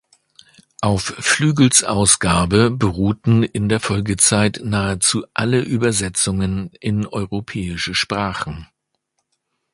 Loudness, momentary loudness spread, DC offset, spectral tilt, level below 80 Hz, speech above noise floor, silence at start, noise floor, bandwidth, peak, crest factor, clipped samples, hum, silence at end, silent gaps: -17 LUFS; 11 LU; under 0.1%; -4 dB/octave; -40 dBFS; 55 dB; 0.8 s; -73 dBFS; 11.5 kHz; 0 dBFS; 18 dB; under 0.1%; none; 1.1 s; none